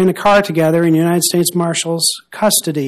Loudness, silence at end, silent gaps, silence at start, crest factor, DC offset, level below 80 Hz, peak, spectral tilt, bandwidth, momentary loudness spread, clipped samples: -14 LUFS; 0 s; none; 0 s; 12 dB; under 0.1%; -52 dBFS; 0 dBFS; -4 dB/octave; 15 kHz; 4 LU; under 0.1%